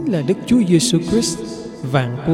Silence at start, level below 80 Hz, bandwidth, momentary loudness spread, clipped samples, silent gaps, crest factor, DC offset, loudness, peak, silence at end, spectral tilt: 0 s; -44 dBFS; 15.5 kHz; 13 LU; under 0.1%; none; 14 dB; under 0.1%; -17 LUFS; -2 dBFS; 0 s; -5.5 dB/octave